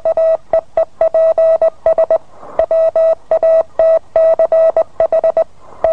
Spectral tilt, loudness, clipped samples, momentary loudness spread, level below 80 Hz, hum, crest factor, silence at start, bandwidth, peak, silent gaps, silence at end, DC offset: -6 dB/octave; -13 LUFS; under 0.1%; 7 LU; -48 dBFS; none; 12 dB; 0.05 s; 5.4 kHz; 0 dBFS; none; 0 s; 2%